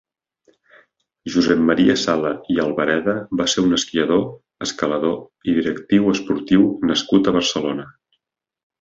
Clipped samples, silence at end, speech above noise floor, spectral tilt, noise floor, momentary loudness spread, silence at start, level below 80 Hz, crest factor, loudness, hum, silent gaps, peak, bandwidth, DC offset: under 0.1%; 0.9 s; 56 dB; -4.5 dB/octave; -75 dBFS; 8 LU; 1.25 s; -52 dBFS; 18 dB; -19 LUFS; none; none; -2 dBFS; 7.8 kHz; under 0.1%